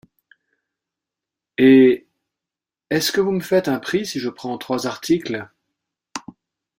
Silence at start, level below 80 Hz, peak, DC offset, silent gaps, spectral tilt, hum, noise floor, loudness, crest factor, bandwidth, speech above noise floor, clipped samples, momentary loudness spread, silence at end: 1.6 s; -62 dBFS; -2 dBFS; under 0.1%; none; -5 dB/octave; none; -88 dBFS; -19 LUFS; 18 dB; 16 kHz; 70 dB; under 0.1%; 20 LU; 0.6 s